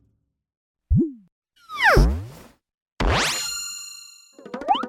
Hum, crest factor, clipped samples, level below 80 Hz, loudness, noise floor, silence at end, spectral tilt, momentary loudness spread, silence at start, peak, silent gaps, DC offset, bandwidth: none; 22 dB; under 0.1%; -30 dBFS; -22 LUFS; -69 dBFS; 0 s; -4 dB/octave; 21 LU; 0.9 s; -2 dBFS; 1.32-1.42 s, 2.74-2.86 s, 2.92-2.96 s; under 0.1%; 16.5 kHz